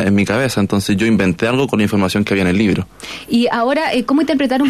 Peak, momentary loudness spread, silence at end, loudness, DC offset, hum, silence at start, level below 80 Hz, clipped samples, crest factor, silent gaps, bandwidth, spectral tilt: -4 dBFS; 3 LU; 0 s; -15 LUFS; under 0.1%; none; 0 s; -46 dBFS; under 0.1%; 12 dB; none; 14 kHz; -6 dB/octave